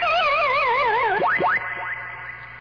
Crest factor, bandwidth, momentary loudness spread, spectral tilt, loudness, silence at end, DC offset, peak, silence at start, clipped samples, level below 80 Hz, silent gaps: 8 dB; 5.4 kHz; 13 LU; -4.5 dB/octave; -20 LUFS; 0 s; under 0.1%; -14 dBFS; 0 s; under 0.1%; -52 dBFS; none